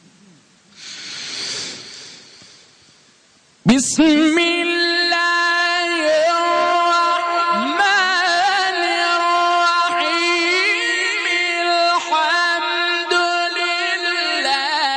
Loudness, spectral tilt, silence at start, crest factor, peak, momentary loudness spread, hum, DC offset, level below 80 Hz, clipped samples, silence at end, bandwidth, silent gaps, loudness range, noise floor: -16 LUFS; -2.5 dB/octave; 0.8 s; 12 dB; -6 dBFS; 9 LU; none; under 0.1%; -58 dBFS; under 0.1%; 0 s; 10.5 kHz; none; 5 LU; -53 dBFS